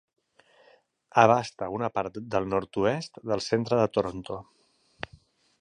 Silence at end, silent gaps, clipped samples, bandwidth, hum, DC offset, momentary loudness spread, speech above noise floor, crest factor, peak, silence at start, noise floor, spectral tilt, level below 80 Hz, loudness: 1.2 s; none; under 0.1%; 10.5 kHz; none; under 0.1%; 19 LU; 35 dB; 24 dB; -4 dBFS; 1.15 s; -62 dBFS; -6 dB/octave; -58 dBFS; -27 LUFS